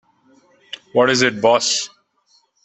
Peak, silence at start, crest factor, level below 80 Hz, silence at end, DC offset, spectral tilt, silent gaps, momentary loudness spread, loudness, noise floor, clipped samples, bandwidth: -2 dBFS; 0.95 s; 18 dB; -64 dBFS; 0.8 s; under 0.1%; -2.5 dB/octave; none; 19 LU; -16 LUFS; -60 dBFS; under 0.1%; 8.6 kHz